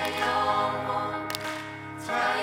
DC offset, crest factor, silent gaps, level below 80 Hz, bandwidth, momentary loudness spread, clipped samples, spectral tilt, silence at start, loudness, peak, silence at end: under 0.1%; 18 dB; none; -64 dBFS; 16.5 kHz; 11 LU; under 0.1%; -3.5 dB/octave; 0 s; -28 LUFS; -10 dBFS; 0 s